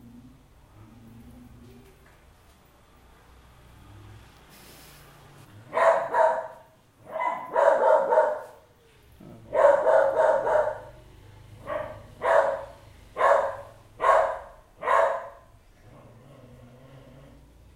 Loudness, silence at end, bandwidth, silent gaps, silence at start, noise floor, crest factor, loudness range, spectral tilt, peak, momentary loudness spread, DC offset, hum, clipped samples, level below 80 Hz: -24 LUFS; 2.45 s; 15.5 kHz; none; 0.15 s; -56 dBFS; 20 dB; 5 LU; -4.5 dB/octave; -6 dBFS; 19 LU; under 0.1%; none; under 0.1%; -58 dBFS